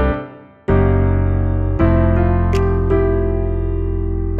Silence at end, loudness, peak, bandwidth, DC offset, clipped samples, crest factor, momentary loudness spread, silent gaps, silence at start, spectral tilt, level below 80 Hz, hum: 0 s; -17 LUFS; -4 dBFS; 7 kHz; under 0.1%; under 0.1%; 12 dB; 7 LU; none; 0 s; -9.5 dB/octave; -20 dBFS; none